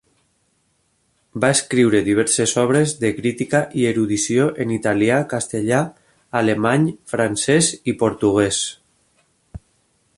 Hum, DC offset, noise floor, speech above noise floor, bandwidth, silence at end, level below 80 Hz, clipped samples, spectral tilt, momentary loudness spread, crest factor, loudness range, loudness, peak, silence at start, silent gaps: none; under 0.1%; -65 dBFS; 47 dB; 11.5 kHz; 0.6 s; -52 dBFS; under 0.1%; -4.5 dB/octave; 6 LU; 16 dB; 2 LU; -18 LUFS; -2 dBFS; 1.35 s; none